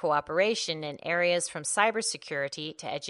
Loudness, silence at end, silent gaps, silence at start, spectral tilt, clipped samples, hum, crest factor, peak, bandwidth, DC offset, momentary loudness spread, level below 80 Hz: -28 LUFS; 0 s; none; 0 s; -2.5 dB/octave; under 0.1%; none; 20 dB; -8 dBFS; 11.5 kHz; under 0.1%; 8 LU; -72 dBFS